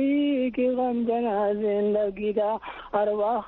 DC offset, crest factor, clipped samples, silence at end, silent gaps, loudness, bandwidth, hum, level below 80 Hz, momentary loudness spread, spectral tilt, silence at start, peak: under 0.1%; 14 dB; under 0.1%; 0 s; none; -25 LUFS; 4.2 kHz; none; -58 dBFS; 3 LU; -5 dB/octave; 0 s; -10 dBFS